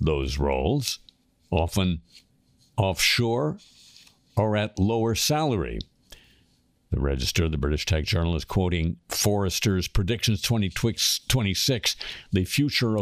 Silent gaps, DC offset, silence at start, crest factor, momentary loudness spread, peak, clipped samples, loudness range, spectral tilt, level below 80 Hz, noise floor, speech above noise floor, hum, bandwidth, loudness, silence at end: none; under 0.1%; 0 s; 18 dB; 8 LU; -8 dBFS; under 0.1%; 3 LU; -4.5 dB/octave; -36 dBFS; -64 dBFS; 40 dB; none; 15.5 kHz; -25 LUFS; 0 s